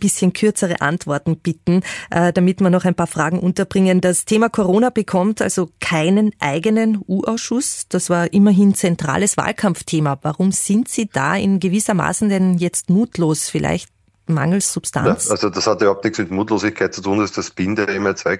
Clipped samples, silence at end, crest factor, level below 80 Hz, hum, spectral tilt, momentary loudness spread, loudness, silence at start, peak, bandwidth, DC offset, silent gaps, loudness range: under 0.1%; 0 s; 14 dB; -52 dBFS; none; -5 dB/octave; 5 LU; -17 LUFS; 0 s; -2 dBFS; 12 kHz; under 0.1%; none; 2 LU